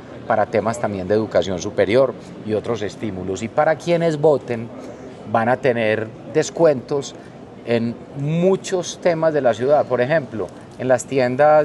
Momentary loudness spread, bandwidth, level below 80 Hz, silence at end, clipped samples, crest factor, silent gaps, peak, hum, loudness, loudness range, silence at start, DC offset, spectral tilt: 12 LU; 12 kHz; -56 dBFS; 0 s; under 0.1%; 16 dB; none; -4 dBFS; none; -20 LUFS; 2 LU; 0 s; under 0.1%; -6 dB/octave